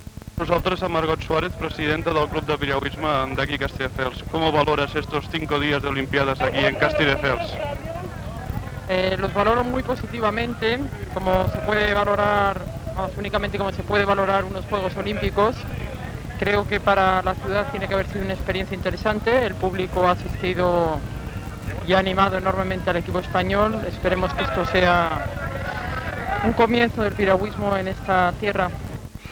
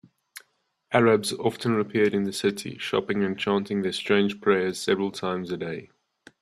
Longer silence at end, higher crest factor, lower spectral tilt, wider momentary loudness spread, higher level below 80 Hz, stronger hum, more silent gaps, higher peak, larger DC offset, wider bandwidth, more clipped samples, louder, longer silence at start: second, 0 s vs 0.55 s; about the same, 18 dB vs 20 dB; about the same, -6 dB/octave vs -5 dB/octave; about the same, 10 LU vs 9 LU; first, -36 dBFS vs -66 dBFS; neither; neither; about the same, -4 dBFS vs -6 dBFS; neither; first, 19 kHz vs 13.5 kHz; neither; first, -22 LUFS vs -25 LUFS; second, 0 s vs 0.35 s